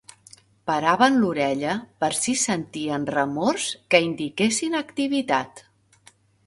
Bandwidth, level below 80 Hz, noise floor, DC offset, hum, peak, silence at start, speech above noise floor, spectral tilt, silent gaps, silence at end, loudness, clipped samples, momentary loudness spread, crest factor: 12 kHz; -64 dBFS; -57 dBFS; under 0.1%; none; 0 dBFS; 0.65 s; 34 dB; -3.5 dB/octave; none; 0.85 s; -23 LUFS; under 0.1%; 9 LU; 24 dB